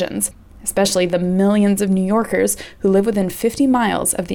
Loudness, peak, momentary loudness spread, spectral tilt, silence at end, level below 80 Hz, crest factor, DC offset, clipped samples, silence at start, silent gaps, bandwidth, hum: -17 LUFS; -4 dBFS; 6 LU; -5 dB/octave; 0 s; -46 dBFS; 12 dB; under 0.1%; under 0.1%; 0 s; none; 18.5 kHz; none